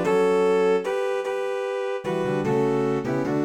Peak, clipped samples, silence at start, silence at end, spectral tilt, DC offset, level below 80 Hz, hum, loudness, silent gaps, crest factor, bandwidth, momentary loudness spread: -12 dBFS; under 0.1%; 0 s; 0 s; -6.5 dB/octave; under 0.1%; -62 dBFS; none; -24 LUFS; none; 12 dB; 11.5 kHz; 7 LU